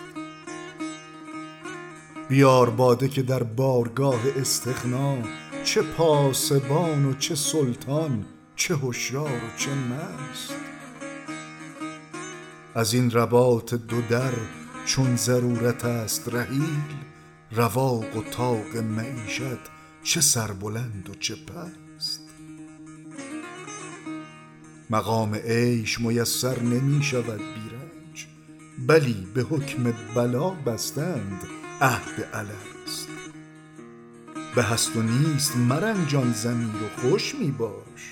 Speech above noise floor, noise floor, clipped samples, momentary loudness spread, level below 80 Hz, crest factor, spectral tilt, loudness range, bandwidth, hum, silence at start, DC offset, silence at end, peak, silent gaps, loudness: 23 dB; -47 dBFS; under 0.1%; 19 LU; -60 dBFS; 20 dB; -4.5 dB/octave; 8 LU; 17.5 kHz; none; 0 s; under 0.1%; 0 s; -6 dBFS; none; -25 LUFS